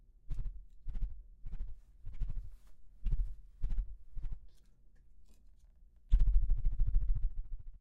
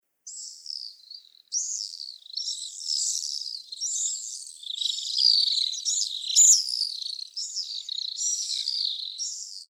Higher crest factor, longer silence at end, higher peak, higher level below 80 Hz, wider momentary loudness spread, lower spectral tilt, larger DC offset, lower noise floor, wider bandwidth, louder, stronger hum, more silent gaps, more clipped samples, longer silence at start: about the same, 18 dB vs 22 dB; about the same, 0.05 s vs 0.05 s; second, -16 dBFS vs -6 dBFS; first, -36 dBFS vs under -90 dBFS; about the same, 18 LU vs 18 LU; first, -8.5 dB/octave vs 9 dB/octave; neither; first, -60 dBFS vs -48 dBFS; second, 1.1 kHz vs 17.5 kHz; second, -41 LUFS vs -24 LUFS; neither; neither; neither; about the same, 0.3 s vs 0.25 s